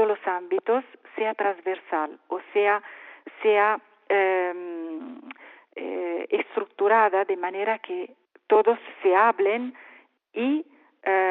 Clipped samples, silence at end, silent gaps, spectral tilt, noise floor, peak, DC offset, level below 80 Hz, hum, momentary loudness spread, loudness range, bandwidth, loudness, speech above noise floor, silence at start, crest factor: under 0.1%; 0 s; none; -1 dB/octave; -46 dBFS; -8 dBFS; under 0.1%; under -90 dBFS; none; 19 LU; 4 LU; 4 kHz; -25 LUFS; 22 dB; 0 s; 18 dB